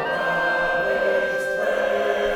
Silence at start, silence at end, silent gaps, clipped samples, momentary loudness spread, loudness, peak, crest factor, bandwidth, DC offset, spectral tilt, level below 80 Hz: 0 s; 0 s; none; under 0.1%; 2 LU; -22 LUFS; -8 dBFS; 14 dB; 16.5 kHz; under 0.1%; -4 dB/octave; -50 dBFS